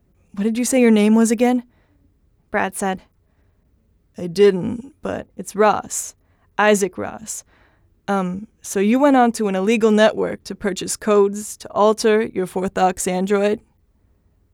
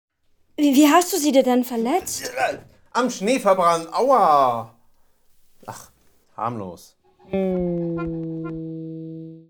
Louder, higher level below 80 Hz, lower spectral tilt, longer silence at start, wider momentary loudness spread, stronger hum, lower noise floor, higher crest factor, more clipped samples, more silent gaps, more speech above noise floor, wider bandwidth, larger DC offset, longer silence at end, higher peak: about the same, -19 LUFS vs -20 LUFS; about the same, -54 dBFS vs -54 dBFS; about the same, -4.5 dB/octave vs -4.5 dB/octave; second, 0.35 s vs 0.6 s; second, 15 LU vs 21 LU; neither; about the same, -59 dBFS vs -56 dBFS; about the same, 16 dB vs 18 dB; neither; neither; first, 42 dB vs 36 dB; second, 17 kHz vs over 20 kHz; neither; first, 0.95 s vs 0.1 s; about the same, -4 dBFS vs -4 dBFS